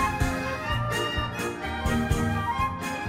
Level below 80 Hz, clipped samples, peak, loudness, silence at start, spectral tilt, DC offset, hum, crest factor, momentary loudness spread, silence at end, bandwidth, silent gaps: -36 dBFS; under 0.1%; -10 dBFS; -28 LUFS; 0 s; -5 dB/octave; under 0.1%; none; 16 dB; 4 LU; 0 s; 16 kHz; none